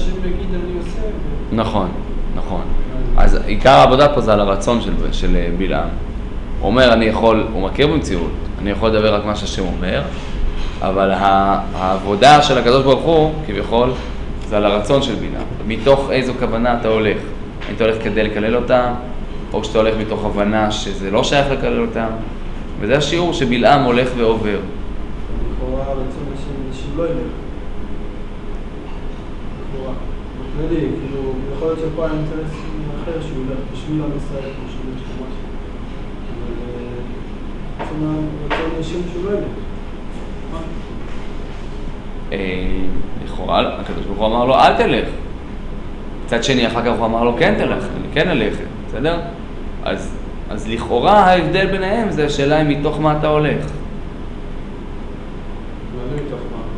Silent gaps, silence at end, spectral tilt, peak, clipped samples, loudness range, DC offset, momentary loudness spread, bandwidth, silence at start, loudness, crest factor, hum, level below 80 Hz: none; 0 s; -6 dB/octave; 0 dBFS; under 0.1%; 12 LU; under 0.1%; 18 LU; 10.5 kHz; 0 s; -17 LUFS; 16 dB; none; -24 dBFS